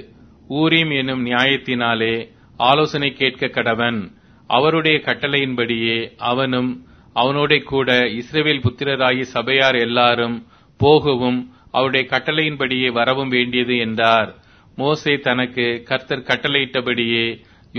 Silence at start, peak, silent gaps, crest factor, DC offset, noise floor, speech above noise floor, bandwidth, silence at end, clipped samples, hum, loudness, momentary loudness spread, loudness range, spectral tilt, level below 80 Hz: 0 s; 0 dBFS; none; 18 dB; under 0.1%; -44 dBFS; 26 dB; 6.6 kHz; 0 s; under 0.1%; none; -18 LUFS; 7 LU; 2 LU; -6 dB/octave; -52 dBFS